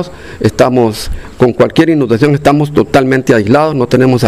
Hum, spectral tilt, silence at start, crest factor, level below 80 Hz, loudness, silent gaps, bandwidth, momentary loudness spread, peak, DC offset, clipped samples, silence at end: none; -6.5 dB/octave; 0 s; 10 dB; -30 dBFS; -10 LUFS; none; 15.5 kHz; 6 LU; 0 dBFS; 1%; 1%; 0 s